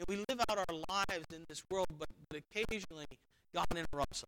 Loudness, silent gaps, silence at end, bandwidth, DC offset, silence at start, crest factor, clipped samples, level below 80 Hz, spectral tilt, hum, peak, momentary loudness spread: -40 LUFS; none; 0 s; 18.5 kHz; under 0.1%; 0 s; 22 dB; under 0.1%; -54 dBFS; -3.5 dB/octave; none; -18 dBFS; 13 LU